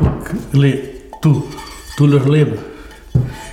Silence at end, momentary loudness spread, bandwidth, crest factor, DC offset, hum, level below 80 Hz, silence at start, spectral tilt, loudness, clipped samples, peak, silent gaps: 0 s; 18 LU; 13.5 kHz; 14 dB; under 0.1%; none; -32 dBFS; 0 s; -8 dB/octave; -16 LUFS; under 0.1%; -2 dBFS; none